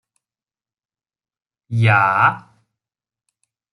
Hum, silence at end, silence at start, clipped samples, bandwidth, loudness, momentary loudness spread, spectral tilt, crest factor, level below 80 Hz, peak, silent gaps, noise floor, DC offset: none; 1.35 s; 1.7 s; under 0.1%; 11 kHz; -16 LUFS; 13 LU; -7 dB/octave; 20 dB; -58 dBFS; -2 dBFS; none; under -90 dBFS; under 0.1%